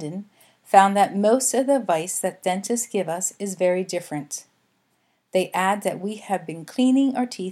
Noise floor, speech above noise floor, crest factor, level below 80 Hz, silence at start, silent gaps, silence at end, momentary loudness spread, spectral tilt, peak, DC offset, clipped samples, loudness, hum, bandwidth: -68 dBFS; 46 dB; 22 dB; -80 dBFS; 0 s; none; 0 s; 12 LU; -4 dB/octave; 0 dBFS; under 0.1%; under 0.1%; -22 LUFS; none; 15.5 kHz